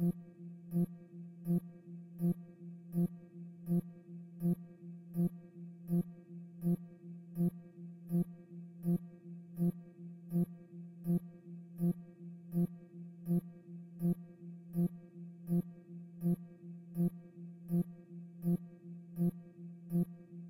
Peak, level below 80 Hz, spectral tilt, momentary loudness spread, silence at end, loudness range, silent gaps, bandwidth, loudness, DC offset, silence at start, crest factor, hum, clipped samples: -24 dBFS; -70 dBFS; -11 dB/octave; 15 LU; 0 s; 1 LU; none; 16 kHz; -39 LUFS; under 0.1%; 0 s; 14 dB; none; under 0.1%